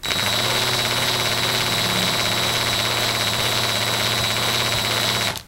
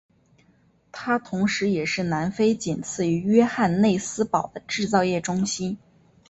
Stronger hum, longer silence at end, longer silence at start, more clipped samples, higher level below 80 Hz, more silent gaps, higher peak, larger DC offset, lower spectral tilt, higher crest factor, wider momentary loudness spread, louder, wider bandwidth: neither; second, 0 s vs 0.5 s; second, 0 s vs 0.95 s; neither; first, -46 dBFS vs -58 dBFS; neither; about the same, -4 dBFS vs -6 dBFS; neither; second, -2 dB/octave vs -5 dB/octave; about the same, 18 dB vs 18 dB; second, 1 LU vs 9 LU; first, -19 LUFS vs -23 LUFS; first, 16 kHz vs 8.2 kHz